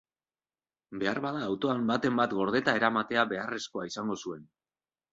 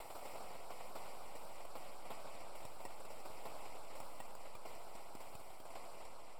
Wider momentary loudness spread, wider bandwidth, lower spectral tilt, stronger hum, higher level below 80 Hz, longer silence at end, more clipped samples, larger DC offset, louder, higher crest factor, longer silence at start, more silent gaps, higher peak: first, 10 LU vs 3 LU; second, 7.8 kHz vs over 20 kHz; first, -5 dB/octave vs -3 dB/octave; neither; about the same, -70 dBFS vs -72 dBFS; first, 0.7 s vs 0 s; neither; second, under 0.1% vs 0.7%; first, -30 LUFS vs -53 LUFS; about the same, 22 dB vs 18 dB; first, 0.9 s vs 0 s; neither; first, -10 dBFS vs -32 dBFS